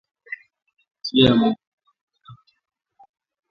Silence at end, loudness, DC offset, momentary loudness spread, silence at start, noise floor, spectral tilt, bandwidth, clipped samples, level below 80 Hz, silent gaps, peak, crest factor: 1.2 s; -19 LUFS; under 0.1%; 21 LU; 0.3 s; -49 dBFS; -7 dB/octave; 7 kHz; under 0.1%; -54 dBFS; 0.91-0.95 s, 1.67-1.78 s, 2.01-2.08 s; -2 dBFS; 22 dB